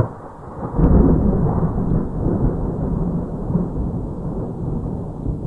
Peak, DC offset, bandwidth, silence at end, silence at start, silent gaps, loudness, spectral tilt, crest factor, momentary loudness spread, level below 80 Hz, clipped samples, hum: 0 dBFS; 0.4%; 2.2 kHz; 0 s; 0 s; none; -21 LUFS; -12.5 dB/octave; 18 dB; 12 LU; -24 dBFS; under 0.1%; none